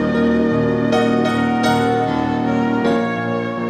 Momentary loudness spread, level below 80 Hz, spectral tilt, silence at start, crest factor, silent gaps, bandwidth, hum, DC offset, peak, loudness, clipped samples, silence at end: 3 LU; -46 dBFS; -6.5 dB/octave; 0 s; 10 dB; none; 14 kHz; none; under 0.1%; -6 dBFS; -17 LUFS; under 0.1%; 0 s